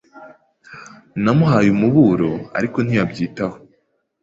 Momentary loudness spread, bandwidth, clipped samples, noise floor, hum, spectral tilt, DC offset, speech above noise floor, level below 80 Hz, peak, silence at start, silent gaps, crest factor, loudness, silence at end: 18 LU; 7.8 kHz; under 0.1%; -65 dBFS; none; -8 dB/octave; under 0.1%; 49 dB; -50 dBFS; -2 dBFS; 0.15 s; none; 16 dB; -17 LUFS; 0.65 s